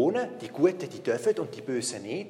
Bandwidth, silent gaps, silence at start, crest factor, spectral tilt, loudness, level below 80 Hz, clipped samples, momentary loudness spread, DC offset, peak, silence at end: 13 kHz; none; 0 s; 18 dB; -4.5 dB/octave; -29 LUFS; -80 dBFS; under 0.1%; 6 LU; under 0.1%; -10 dBFS; 0 s